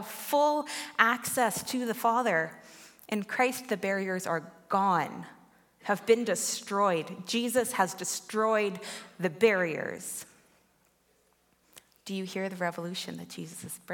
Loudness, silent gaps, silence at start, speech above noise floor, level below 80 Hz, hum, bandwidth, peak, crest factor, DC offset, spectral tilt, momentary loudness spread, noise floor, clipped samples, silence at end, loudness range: -29 LUFS; none; 0 s; 39 dB; -78 dBFS; none; 17.5 kHz; -6 dBFS; 26 dB; under 0.1%; -3.5 dB/octave; 15 LU; -69 dBFS; under 0.1%; 0 s; 10 LU